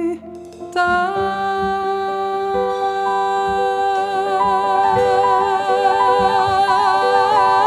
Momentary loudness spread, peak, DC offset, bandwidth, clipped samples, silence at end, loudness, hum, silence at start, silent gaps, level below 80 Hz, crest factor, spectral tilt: 6 LU; -4 dBFS; under 0.1%; 12.5 kHz; under 0.1%; 0 s; -17 LUFS; none; 0 s; none; -48 dBFS; 14 dB; -4.5 dB/octave